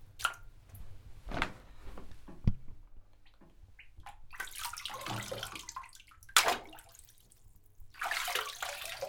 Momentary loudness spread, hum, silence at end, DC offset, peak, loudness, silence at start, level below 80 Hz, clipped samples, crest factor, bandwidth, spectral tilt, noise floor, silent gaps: 24 LU; none; 0 s; under 0.1%; -8 dBFS; -35 LUFS; 0 s; -48 dBFS; under 0.1%; 32 dB; over 20 kHz; -2 dB/octave; -59 dBFS; none